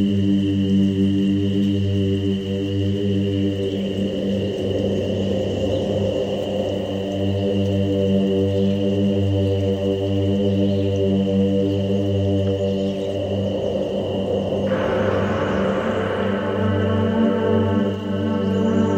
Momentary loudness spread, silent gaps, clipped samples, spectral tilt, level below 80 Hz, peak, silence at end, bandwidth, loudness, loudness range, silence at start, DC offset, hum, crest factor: 4 LU; none; under 0.1%; -8 dB/octave; -46 dBFS; -6 dBFS; 0 s; 8.6 kHz; -21 LUFS; 2 LU; 0 s; under 0.1%; none; 12 dB